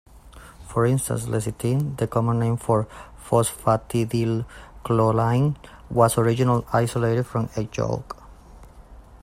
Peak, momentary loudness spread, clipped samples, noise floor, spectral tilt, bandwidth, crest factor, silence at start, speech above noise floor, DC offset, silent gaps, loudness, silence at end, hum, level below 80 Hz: -4 dBFS; 10 LU; under 0.1%; -45 dBFS; -6.5 dB/octave; 15 kHz; 18 dB; 0.15 s; 23 dB; under 0.1%; none; -23 LUFS; 0.05 s; none; -46 dBFS